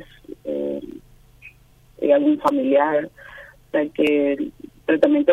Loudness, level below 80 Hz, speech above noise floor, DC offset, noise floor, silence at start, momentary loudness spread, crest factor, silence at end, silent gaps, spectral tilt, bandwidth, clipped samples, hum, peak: -20 LUFS; -56 dBFS; 33 dB; under 0.1%; -52 dBFS; 0 s; 18 LU; 18 dB; 0 s; none; -6.5 dB/octave; 8 kHz; under 0.1%; none; -4 dBFS